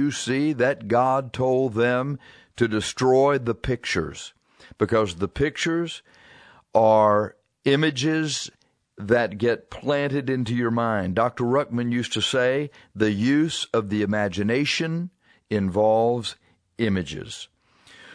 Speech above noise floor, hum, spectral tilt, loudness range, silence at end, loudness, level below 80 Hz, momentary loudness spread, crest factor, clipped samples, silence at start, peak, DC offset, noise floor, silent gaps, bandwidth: 30 dB; none; -5.5 dB/octave; 2 LU; 0 s; -23 LUFS; -52 dBFS; 12 LU; 20 dB; under 0.1%; 0 s; -4 dBFS; under 0.1%; -53 dBFS; none; 11 kHz